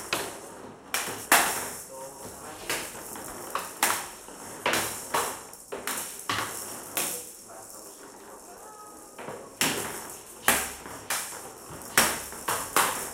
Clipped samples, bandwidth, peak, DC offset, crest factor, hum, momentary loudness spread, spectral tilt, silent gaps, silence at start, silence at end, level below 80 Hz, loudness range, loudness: under 0.1%; 17 kHz; -4 dBFS; under 0.1%; 28 dB; none; 19 LU; -1 dB/octave; none; 0 s; 0 s; -60 dBFS; 6 LU; -28 LUFS